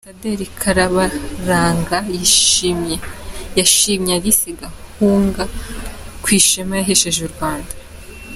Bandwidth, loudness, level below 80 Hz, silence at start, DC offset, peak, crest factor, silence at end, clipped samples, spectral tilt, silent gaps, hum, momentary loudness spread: 16 kHz; -15 LUFS; -34 dBFS; 0.05 s; under 0.1%; 0 dBFS; 18 dB; 0 s; under 0.1%; -2.5 dB/octave; none; none; 19 LU